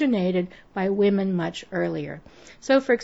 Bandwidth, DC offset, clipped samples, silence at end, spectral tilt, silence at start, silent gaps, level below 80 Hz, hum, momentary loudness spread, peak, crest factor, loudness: 8 kHz; 0.1%; under 0.1%; 0 s; -6.5 dB/octave; 0 s; none; -60 dBFS; none; 13 LU; -6 dBFS; 18 dB; -24 LUFS